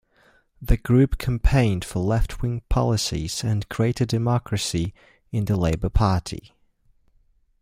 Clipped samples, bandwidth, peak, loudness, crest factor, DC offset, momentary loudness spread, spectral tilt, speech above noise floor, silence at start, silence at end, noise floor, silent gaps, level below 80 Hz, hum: under 0.1%; 15.5 kHz; -4 dBFS; -23 LUFS; 18 dB; under 0.1%; 8 LU; -6 dB/octave; 39 dB; 0.6 s; 1.2 s; -61 dBFS; none; -30 dBFS; none